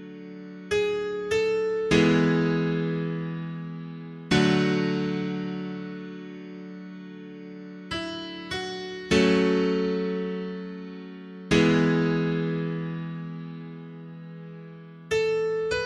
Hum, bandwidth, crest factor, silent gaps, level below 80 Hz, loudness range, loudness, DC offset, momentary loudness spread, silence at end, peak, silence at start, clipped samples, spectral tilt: none; 11.5 kHz; 20 dB; none; -54 dBFS; 8 LU; -26 LUFS; under 0.1%; 20 LU; 0 s; -6 dBFS; 0 s; under 0.1%; -6 dB/octave